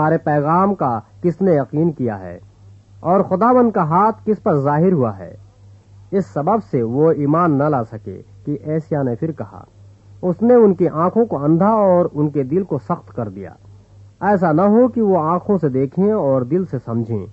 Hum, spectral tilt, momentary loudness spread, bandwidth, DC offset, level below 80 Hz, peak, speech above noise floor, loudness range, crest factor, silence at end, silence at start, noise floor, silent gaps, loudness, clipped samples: none; -11 dB/octave; 13 LU; 7.6 kHz; under 0.1%; -54 dBFS; -2 dBFS; 28 dB; 3 LU; 16 dB; 0 s; 0 s; -45 dBFS; none; -17 LUFS; under 0.1%